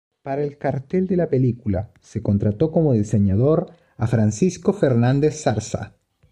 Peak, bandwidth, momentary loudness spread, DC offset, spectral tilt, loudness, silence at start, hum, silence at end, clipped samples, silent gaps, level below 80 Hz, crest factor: -6 dBFS; 9.8 kHz; 10 LU; under 0.1%; -7.5 dB/octave; -21 LUFS; 0.25 s; none; 0.45 s; under 0.1%; none; -48 dBFS; 16 dB